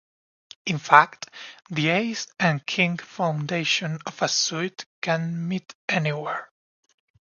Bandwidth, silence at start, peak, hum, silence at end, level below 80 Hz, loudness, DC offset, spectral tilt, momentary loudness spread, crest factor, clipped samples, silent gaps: 7.4 kHz; 0.65 s; 0 dBFS; none; 0.9 s; -70 dBFS; -24 LUFS; under 0.1%; -4 dB/octave; 15 LU; 26 dB; under 0.1%; 4.86-5.02 s, 5.75-5.88 s